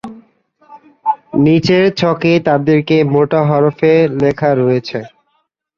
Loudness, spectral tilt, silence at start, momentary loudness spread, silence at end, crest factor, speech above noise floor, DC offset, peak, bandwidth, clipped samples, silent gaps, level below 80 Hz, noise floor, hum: -13 LUFS; -7.5 dB/octave; 0.05 s; 8 LU; 0.7 s; 14 dB; 52 dB; under 0.1%; 0 dBFS; 7.2 kHz; under 0.1%; none; -50 dBFS; -64 dBFS; none